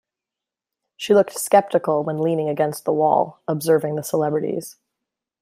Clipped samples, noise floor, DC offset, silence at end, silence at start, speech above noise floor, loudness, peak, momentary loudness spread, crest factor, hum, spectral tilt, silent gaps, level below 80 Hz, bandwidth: under 0.1%; -87 dBFS; under 0.1%; 0.7 s; 1 s; 68 dB; -20 LUFS; -2 dBFS; 8 LU; 18 dB; none; -5.5 dB/octave; none; -70 dBFS; 16 kHz